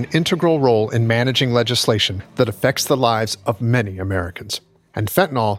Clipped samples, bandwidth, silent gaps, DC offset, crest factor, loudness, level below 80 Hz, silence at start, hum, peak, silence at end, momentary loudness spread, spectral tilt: under 0.1%; 16.5 kHz; none; under 0.1%; 18 dB; -18 LUFS; -50 dBFS; 0 s; none; 0 dBFS; 0 s; 10 LU; -5 dB/octave